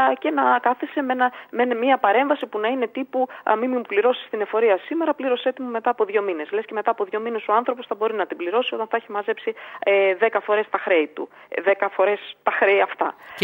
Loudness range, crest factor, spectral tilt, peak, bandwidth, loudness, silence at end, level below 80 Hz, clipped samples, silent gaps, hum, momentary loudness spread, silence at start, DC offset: 3 LU; 18 dB; -6 dB/octave; -4 dBFS; 16 kHz; -22 LUFS; 0 s; -82 dBFS; under 0.1%; none; none; 8 LU; 0 s; under 0.1%